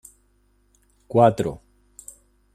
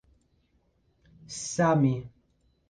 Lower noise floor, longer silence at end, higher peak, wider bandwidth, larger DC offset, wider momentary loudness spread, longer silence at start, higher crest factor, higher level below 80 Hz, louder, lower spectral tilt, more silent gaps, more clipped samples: second, -63 dBFS vs -69 dBFS; first, 0.95 s vs 0.6 s; first, -2 dBFS vs -12 dBFS; first, 15 kHz vs 10 kHz; neither; first, 26 LU vs 14 LU; second, 1.1 s vs 1.3 s; about the same, 22 dB vs 18 dB; first, -54 dBFS vs -62 dBFS; first, -20 LUFS vs -27 LUFS; about the same, -7 dB/octave vs -6 dB/octave; neither; neither